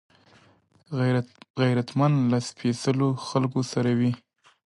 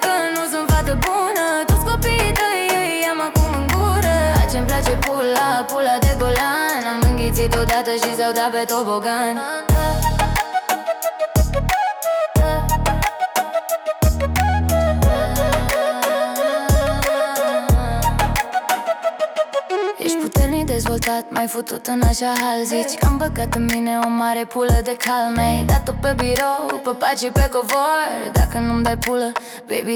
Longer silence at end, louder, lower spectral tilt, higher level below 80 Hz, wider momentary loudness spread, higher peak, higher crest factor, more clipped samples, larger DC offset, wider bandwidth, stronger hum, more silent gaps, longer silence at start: first, 0.5 s vs 0 s; second, -25 LUFS vs -19 LUFS; first, -7 dB/octave vs -5 dB/octave; second, -66 dBFS vs -24 dBFS; about the same, 6 LU vs 4 LU; second, -10 dBFS vs -6 dBFS; about the same, 16 dB vs 12 dB; neither; neither; second, 11.5 kHz vs over 20 kHz; neither; first, 1.50-1.54 s vs none; first, 0.9 s vs 0 s